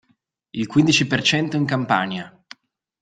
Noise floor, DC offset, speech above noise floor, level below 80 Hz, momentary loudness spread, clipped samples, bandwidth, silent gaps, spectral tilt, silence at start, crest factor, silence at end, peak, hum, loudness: -66 dBFS; under 0.1%; 47 dB; -58 dBFS; 15 LU; under 0.1%; 9.4 kHz; none; -4.5 dB/octave; 0.55 s; 20 dB; 0.75 s; -2 dBFS; none; -19 LUFS